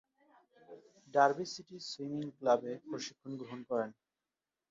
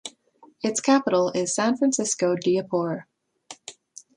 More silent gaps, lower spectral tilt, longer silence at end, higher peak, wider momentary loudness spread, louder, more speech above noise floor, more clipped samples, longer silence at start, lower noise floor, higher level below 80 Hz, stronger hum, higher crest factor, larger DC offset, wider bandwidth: neither; about the same, -3.5 dB/octave vs -4 dB/octave; first, 0.8 s vs 0.45 s; second, -14 dBFS vs -8 dBFS; second, 15 LU vs 20 LU; second, -36 LUFS vs -23 LUFS; first, over 55 dB vs 33 dB; neither; first, 0.7 s vs 0.05 s; first, under -90 dBFS vs -56 dBFS; second, -84 dBFS vs -72 dBFS; neither; first, 24 dB vs 18 dB; neither; second, 7.6 kHz vs 11 kHz